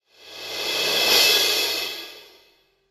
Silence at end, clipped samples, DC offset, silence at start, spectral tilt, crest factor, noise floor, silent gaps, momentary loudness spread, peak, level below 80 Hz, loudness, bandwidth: 0.7 s; under 0.1%; under 0.1%; 0.25 s; 1 dB/octave; 18 dB; -60 dBFS; none; 20 LU; -6 dBFS; -64 dBFS; -18 LUFS; 19.5 kHz